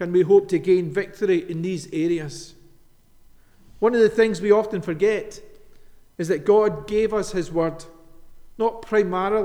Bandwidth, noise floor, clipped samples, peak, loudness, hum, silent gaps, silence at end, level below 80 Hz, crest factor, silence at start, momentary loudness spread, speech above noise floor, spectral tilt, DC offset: 11.5 kHz; -52 dBFS; under 0.1%; -4 dBFS; -21 LUFS; none; none; 0 s; -50 dBFS; 18 dB; 0 s; 10 LU; 31 dB; -6.5 dB/octave; under 0.1%